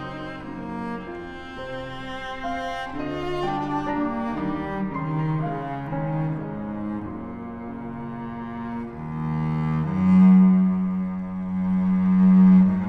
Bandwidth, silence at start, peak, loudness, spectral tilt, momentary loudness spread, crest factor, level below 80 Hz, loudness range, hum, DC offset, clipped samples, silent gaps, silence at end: 4.9 kHz; 0 s; -8 dBFS; -23 LUFS; -9.5 dB/octave; 18 LU; 14 dB; -46 dBFS; 11 LU; none; under 0.1%; under 0.1%; none; 0 s